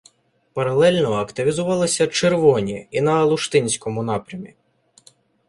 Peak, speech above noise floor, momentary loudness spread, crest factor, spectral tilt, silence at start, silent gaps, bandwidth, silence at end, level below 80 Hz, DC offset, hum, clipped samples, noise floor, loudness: -2 dBFS; 39 dB; 9 LU; 18 dB; -4.5 dB/octave; 0.55 s; none; 11.5 kHz; 1 s; -56 dBFS; under 0.1%; none; under 0.1%; -58 dBFS; -19 LUFS